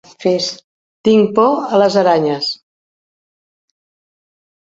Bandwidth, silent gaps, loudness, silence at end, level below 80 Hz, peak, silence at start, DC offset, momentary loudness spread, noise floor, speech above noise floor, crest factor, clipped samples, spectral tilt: 7.8 kHz; 0.64-1.04 s; -14 LUFS; 2.1 s; -62 dBFS; -2 dBFS; 0.2 s; under 0.1%; 10 LU; under -90 dBFS; over 77 dB; 16 dB; under 0.1%; -5.5 dB/octave